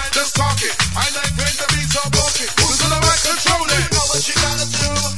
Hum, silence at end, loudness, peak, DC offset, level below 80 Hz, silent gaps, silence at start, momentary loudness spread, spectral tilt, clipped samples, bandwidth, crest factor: none; 0 s; -15 LUFS; 0 dBFS; 3%; -32 dBFS; none; 0 s; 4 LU; -2 dB/octave; under 0.1%; 12 kHz; 16 dB